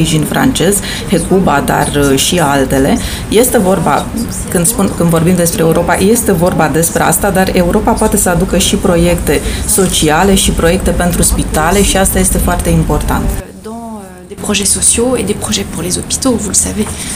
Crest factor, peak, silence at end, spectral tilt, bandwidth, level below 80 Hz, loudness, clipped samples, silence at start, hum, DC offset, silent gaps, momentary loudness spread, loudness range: 10 dB; 0 dBFS; 0 s; -4 dB/octave; 16.5 kHz; -22 dBFS; -10 LUFS; under 0.1%; 0 s; none; under 0.1%; none; 6 LU; 3 LU